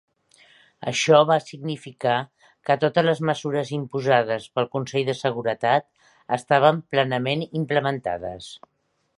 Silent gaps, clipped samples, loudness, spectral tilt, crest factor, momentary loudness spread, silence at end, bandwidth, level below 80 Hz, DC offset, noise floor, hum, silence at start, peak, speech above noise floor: none; under 0.1%; -23 LUFS; -5 dB/octave; 22 dB; 14 LU; 0.6 s; 11.5 kHz; -64 dBFS; under 0.1%; -56 dBFS; none; 0.8 s; -2 dBFS; 34 dB